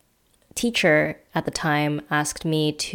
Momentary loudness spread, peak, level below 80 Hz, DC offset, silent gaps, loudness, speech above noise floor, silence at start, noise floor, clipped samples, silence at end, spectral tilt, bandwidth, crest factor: 9 LU; -6 dBFS; -54 dBFS; under 0.1%; none; -23 LUFS; 40 dB; 0.55 s; -63 dBFS; under 0.1%; 0 s; -4 dB/octave; 18 kHz; 18 dB